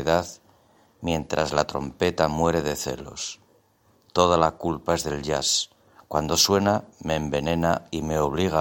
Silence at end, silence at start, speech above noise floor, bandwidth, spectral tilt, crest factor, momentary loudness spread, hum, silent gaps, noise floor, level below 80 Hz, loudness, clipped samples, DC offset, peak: 0 s; 0 s; 38 dB; 17 kHz; -4 dB/octave; 24 dB; 12 LU; none; none; -62 dBFS; -46 dBFS; -24 LUFS; under 0.1%; under 0.1%; -2 dBFS